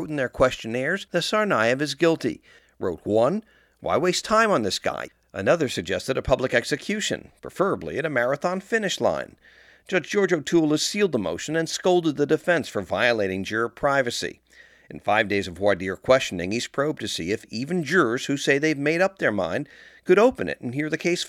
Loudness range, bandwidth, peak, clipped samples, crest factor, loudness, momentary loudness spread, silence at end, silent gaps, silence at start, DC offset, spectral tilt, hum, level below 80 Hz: 2 LU; 15.5 kHz; -4 dBFS; under 0.1%; 20 dB; -23 LUFS; 9 LU; 0 s; none; 0 s; under 0.1%; -4.5 dB/octave; none; -54 dBFS